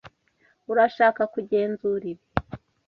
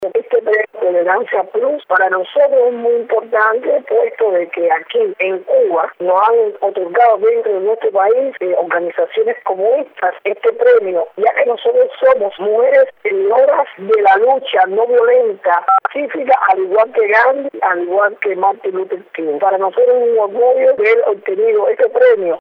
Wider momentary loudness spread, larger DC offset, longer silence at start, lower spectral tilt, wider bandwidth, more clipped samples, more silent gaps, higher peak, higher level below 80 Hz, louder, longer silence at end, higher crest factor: first, 11 LU vs 6 LU; neither; about the same, 0.05 s vs 0 s; first, -8 dB/octave vs -6 dB/octave; first, 6 kHz vs 4.7 kHz; neither; neither; about the same, -2 dBFS vs -2 dBFS; first, -52 dBFS vs -70 dBFS; second, -24 LUFS vs -14 LUFS; first, 0.3 s vs 0 s; first, 22 dB vs 12 dB